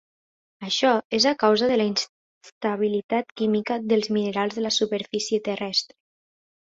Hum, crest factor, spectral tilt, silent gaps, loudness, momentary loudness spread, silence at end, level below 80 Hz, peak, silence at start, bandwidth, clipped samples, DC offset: none; 18 dB; -3.5 dB/octave; 1.05-1.10 s, 2.09-2.41 s, 2.52-2.61 s, 3.04-3.09 s; -23 LUFS; 8 LU; 0.85 s; -68 dBFS; -6 dBFS; 0.6 s; 7.8 kHz; under 0.1%; under 0.1%